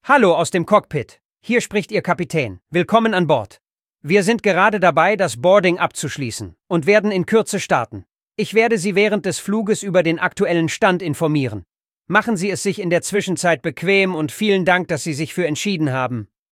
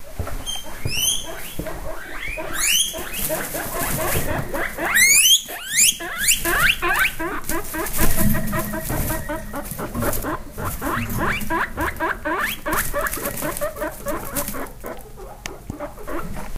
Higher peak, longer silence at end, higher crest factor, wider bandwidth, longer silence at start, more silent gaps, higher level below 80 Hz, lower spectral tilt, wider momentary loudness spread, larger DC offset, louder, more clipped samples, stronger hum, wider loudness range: about the same, 0 dBFS vs -2 dBFS; first, 0.25 s vs 0 s; about the same, 18 dB vs 20 dB; about the same, 16 kHz vs 16 kHz; about the same, 0.05 s vs 0 s; first, 1.25-1.29 s vs none; second, -58 dBFS vs -32 dBFS; first, -5 dB/octave vs -2 dB/octave; second, 11 LU vs 16 LU; neither; first, -18 LUFS vs -21 LUFS; neither; neither; second, 3 LU vs 9 LU